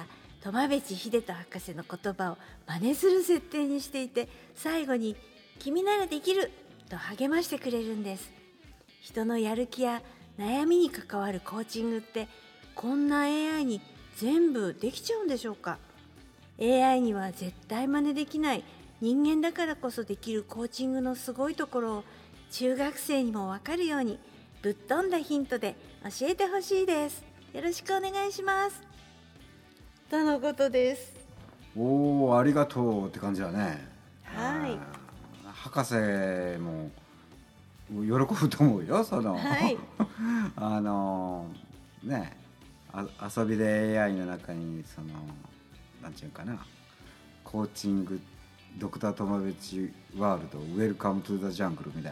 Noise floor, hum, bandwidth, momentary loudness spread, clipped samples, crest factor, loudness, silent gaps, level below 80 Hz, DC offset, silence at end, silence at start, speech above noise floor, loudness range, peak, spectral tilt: -56 dBFS; none; 19.5 kHz; 16 LU; under 0.1%; 20 dB; -30 LUFS; none; -60 dBFS; under 0.1%; 0 s; 0 s; 26 dB; 6 LU; -10 dBFS; -5.5 dB/octave